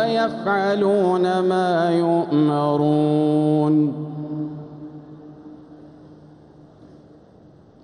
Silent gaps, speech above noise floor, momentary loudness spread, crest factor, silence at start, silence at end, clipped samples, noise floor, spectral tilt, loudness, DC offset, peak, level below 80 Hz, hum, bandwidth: none; 30 dB; 20 LU; 14 dB; 0 s; 1.7 s; under 0.1%; -49 dBFS; -8 dB/octave; -20 LUFS; under 0.1%; -8 dBFS; -64 dBFS; none; 10 kHz